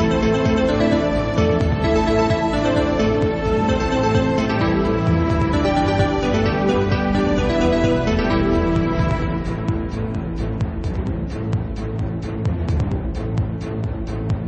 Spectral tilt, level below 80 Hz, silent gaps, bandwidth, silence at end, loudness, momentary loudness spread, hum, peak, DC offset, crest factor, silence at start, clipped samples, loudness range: -7.5 dB/octave; -28 dBFS; none; 8.6 kHz; 0 s; -20 LUFS; 7 LU; none; -4 dBFS; under 0.1%; 14 dB; 0 s; under 0.1%; 6 LU